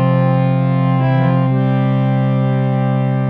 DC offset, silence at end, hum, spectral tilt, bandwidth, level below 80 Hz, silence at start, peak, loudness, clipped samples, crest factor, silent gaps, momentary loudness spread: under 0.1%; 0 s; none; -11.5 dB/octave; 4.1 kHz; -52 dBFS; 0 s; -4 dBFS; -15 LUFS; under 0.1%; 10 dB; none; 2 LU